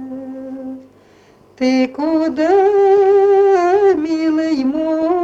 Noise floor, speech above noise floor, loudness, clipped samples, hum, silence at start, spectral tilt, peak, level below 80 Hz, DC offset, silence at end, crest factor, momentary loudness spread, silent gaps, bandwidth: -48 dBFS; 34 dB; -14 LUFS; under 0.1%; none; 0 s; -5.5 dB/octave; -4 dBFS; -56 dBFS; under 0.1%; 0 s; 12 dB; 18 LU; none; 7.8 kHz